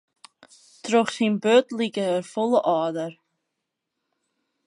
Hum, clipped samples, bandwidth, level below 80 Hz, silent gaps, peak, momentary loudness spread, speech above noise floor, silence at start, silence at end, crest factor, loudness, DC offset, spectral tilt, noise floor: none; under 0.1%; 11 kHz; -78 dBFS; none; -6 dBFS; 11 LU; 60 dB; 0.85 s; 1.55 s; 20 dB; -23 LUFS; under 0.1%; -5 dB/octave; -82 dBFS